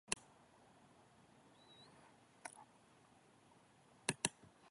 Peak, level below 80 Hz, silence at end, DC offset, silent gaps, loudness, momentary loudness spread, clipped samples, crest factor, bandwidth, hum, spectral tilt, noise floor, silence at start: -16 dBFS; -80 dBFS; 0 s; under 0.1%; none; -45 LUFS; 26 LU; under 0.1%; 36 dB; 11.5 kHz; none; -2 dB/octave; -69 dBFS; 0.1 s